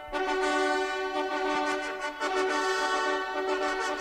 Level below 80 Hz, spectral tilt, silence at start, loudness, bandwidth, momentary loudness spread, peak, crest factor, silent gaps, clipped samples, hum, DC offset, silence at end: -58 dBFS; -1.5 dB/octave; 0 s; -29 LUFS; 15.5 kHz; 4 LU; -14 dBFS; 14 dB; none; under 0.1%; none; under 0.1%; 0 s